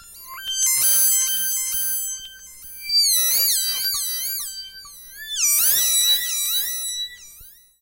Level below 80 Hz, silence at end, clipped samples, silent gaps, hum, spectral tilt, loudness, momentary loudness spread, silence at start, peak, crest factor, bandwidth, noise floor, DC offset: -58 dBFS; 0.3 s; under 0.1%; none; none; 4 dB/octave; -18 LUFS; 21 LU; 0 s; -6 dBFS; 16 dB; 16.5 kHz; -47 dBFS; under 0.1%